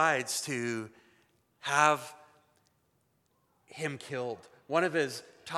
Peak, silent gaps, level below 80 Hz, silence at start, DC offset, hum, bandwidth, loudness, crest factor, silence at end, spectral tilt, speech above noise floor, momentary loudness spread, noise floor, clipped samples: -8 dBFS; none; -84 dBFS; 0 s; under 0.1%; none; 15 kHz; -31 LUFS; 26 dB; 0 s; -3.5 dB/octave; 42 dB; 19 LU; -73 dBFS; under 0.1%